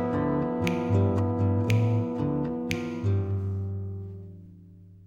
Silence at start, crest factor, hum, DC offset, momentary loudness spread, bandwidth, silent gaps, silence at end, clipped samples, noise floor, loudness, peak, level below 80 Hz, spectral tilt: 0 s; 18 dB; none; under 0.1%; 14 LU; 7.6 kHz; none; 0 s; under 0.1%; -50 dBFS; -27 LUFS; -10 dBFS; -52 dBFS; -8 dB/octave